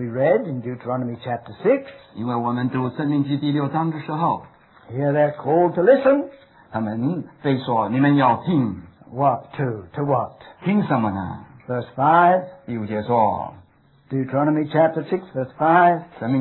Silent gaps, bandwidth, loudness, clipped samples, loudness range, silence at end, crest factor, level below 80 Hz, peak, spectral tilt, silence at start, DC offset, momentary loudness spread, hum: none; 4.2 kHz; -21 LUFS; under 0.1%; 4 LU; 0 s; 16 dB; -62 dBFS; -4 dBFS; -11.5 dB/octave; 0 s; under 0.1%; 14 LU; none